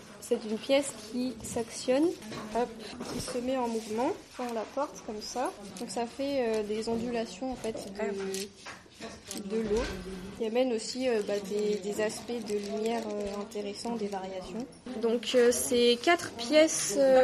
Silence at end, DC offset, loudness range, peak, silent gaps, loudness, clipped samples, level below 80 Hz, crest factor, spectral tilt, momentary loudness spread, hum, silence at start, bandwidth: 0 s; under 0.1%; 6 LU; -10 dBFS; none; -31 LUFS; under 0.1%; -56 dBFS; 20 dB; -3.5 dB/octave; 14 LU; none; 0 s; 13 kHz